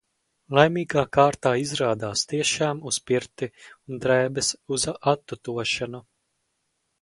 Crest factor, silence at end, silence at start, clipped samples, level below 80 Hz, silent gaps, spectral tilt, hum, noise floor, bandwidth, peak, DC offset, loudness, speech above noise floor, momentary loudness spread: 24 dB; 1 s; 0.5 s; under 0.1%; -58 dBFS; none; -3.5 dB/octave; none; -75 dBFS; 11.5 kHz; -2 dBFS; under 0.1%; -24 LUFS; 51 dB; 13 LU